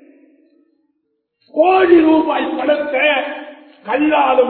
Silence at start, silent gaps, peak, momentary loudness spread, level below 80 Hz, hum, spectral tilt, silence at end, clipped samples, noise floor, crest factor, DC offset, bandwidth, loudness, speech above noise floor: 1.55 s; none; 0 dBFS; 15 LU; -56 dBFS; none; -8 dB/octave; 0 s; under 0.1%; -70 dBFS; 16 dB; under 0.1%; 4.4 kHz; -14 LUFS; 56 dB